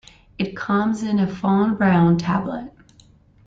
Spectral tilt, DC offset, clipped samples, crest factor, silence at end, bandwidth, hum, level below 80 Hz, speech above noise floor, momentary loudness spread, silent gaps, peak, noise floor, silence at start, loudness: -8 dB/octave; under 0.1%; under 0.1%; 14 dB; 0.8 s; 7.8 kHz; none; -52 dBFS; 33 dB; 12 LU; none; -6 dBFS; -52 dBFS; 0.4 s; -20 LUFS